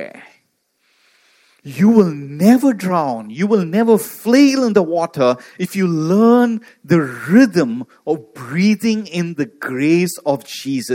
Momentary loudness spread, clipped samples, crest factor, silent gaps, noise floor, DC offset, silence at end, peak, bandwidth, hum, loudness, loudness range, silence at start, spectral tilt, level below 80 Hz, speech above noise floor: 11 LU; under 0.1%; 16 dB; none; -65 dBFS; under 0.1%; 0 s; 0 dBFS; 17 kHz; none; -16 LUFS; 3 LU; 0 s; -6.5 dB/octave; -66 dBFS; 49 dB